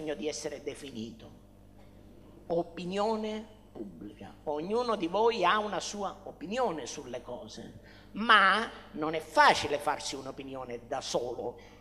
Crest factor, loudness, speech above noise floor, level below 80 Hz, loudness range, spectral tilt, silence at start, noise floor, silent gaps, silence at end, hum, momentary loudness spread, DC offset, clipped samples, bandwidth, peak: 24 dB; -30 LUFS; 23 dB; -60 dBFS; 10 LU; -3 dB/octave; 0 s; -55 dBFS; none; 0 s; 50 Hz at -60 dBFS; 21 LU; under 0.1%; under 0.1%; 14.5 kHz; -8 dBFS